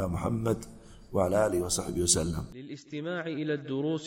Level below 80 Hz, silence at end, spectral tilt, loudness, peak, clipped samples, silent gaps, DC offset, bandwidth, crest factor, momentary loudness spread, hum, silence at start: -48 dBFS; 0 s; -4.5 dB/octave; -30 LUFS; -8 dBFS; under 0.1%; none; under 0.1%; 16.5 kHz; 22 dB; 14 LU; none; 0 s